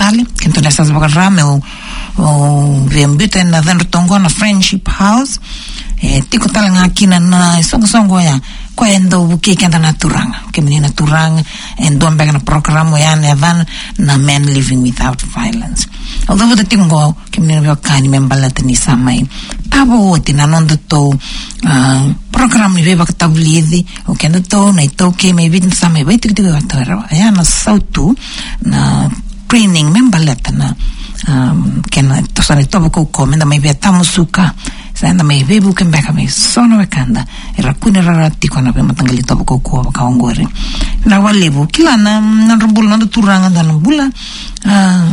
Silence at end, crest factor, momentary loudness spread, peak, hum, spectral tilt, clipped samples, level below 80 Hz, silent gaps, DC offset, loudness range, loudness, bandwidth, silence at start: 0 s; 10 dB; 8 LU; 0 dBFS; none; -5 dB/octave; 0.3%; -22 dBFS; none; under 0.1%; 2 LU; -10 LUFS; 11 kHz; 0 s